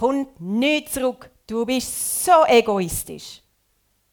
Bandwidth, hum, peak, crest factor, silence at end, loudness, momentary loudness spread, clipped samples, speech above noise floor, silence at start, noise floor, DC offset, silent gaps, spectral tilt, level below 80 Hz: 20 kHz; none; -2 dBFS; 20 dB; 0.75 s; -20 LUFS; 18 LU; under 0.1%; 46 dB; 0 s; -66 dBFS; under 0.1%; none; -3.5 dB/octave; -50 dBFS